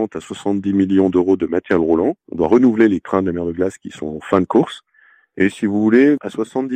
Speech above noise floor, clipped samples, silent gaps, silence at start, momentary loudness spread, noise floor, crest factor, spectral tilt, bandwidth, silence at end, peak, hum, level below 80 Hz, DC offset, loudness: 37 dB; under 0.1%; none; 0 s; 11 LU; -53 dBFS; 16 dB; -7.5 dB/octave; 9.4 kHz; 0 s; -2 dBFS; none; -54 dBFS; under 0.1%; -17 LUFS